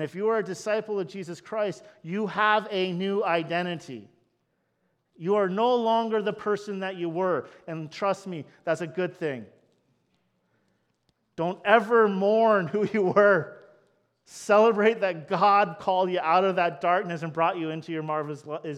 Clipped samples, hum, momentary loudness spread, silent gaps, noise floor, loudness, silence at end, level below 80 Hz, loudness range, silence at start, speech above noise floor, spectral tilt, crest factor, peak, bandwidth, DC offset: under 0.1%; none; 15 LU; none; -74 dBFS; -25 LUFS; 0 s; -76 dBFS; 8 LU; 0 s; 49 dB; -6 dB/octave; 22 dB; -4 dBFS; 11.5 kHz; under 0.1%